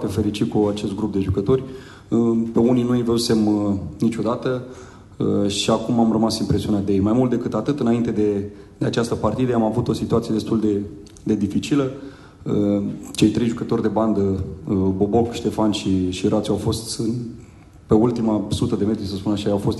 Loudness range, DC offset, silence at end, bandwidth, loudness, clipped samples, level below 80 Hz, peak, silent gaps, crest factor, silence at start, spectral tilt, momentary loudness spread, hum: 2 LU; under 0.1%; 0 s; 12.5 kHz; -21 LUFS; under 0.1%; -46 dBFS; -4 dBFS; none; 16 dB; 0 s; -6.5 dB/octave; 8 LU; none